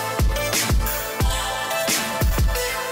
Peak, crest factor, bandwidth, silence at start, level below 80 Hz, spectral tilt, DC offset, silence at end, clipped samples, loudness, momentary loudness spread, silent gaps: -8 dBFS; 14 dB; 16.5 kHz; 0 s; -24 dBFS; -3.5 dB/octave; under 0.1%; 0 s; under 0.1%; -22 LUFS; 3 LU; none